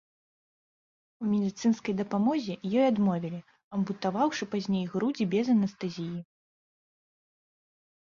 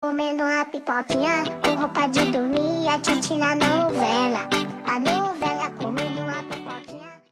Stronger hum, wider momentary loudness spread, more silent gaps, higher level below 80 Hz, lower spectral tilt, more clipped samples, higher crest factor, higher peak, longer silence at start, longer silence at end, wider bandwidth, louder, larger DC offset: neither; about the same, 11 LU vs 9 LU; first, 3.64-3.71 s vs none; second, -70 dBFS vs -56 dBFS; first, -7 dB/octave vs -4 dB/octave; neither; about the same, 16 dB vs 16 dB; second, -14 dBFS vs -8 dBFS; first, 1.2 s vs 0 s; first, 1.8 s vs 0.15 s; second, 7.4 kHz vs 15.5 kHz; second, -29 LUFS vs -23 LUFS; neither